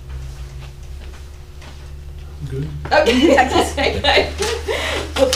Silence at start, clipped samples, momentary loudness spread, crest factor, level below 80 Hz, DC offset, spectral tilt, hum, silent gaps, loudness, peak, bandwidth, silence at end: 0 s; under 0.1%; 23 LU; 16 dB; -30 dBFS; 0.5%; -4 dB/octave; none; none; -16 LUFS; -2 dBFS; 16 kHz; 0 s